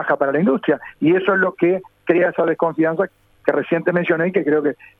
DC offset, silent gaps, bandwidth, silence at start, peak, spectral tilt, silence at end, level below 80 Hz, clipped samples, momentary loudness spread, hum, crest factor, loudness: under 0.1%; none; 4.1 kHz; 0 s; -2 dBFS; -9 dB/octave; 0.25 s; -64 dBFS; under 0.1%; 5 LU; none; 16 dB; -18 LUFS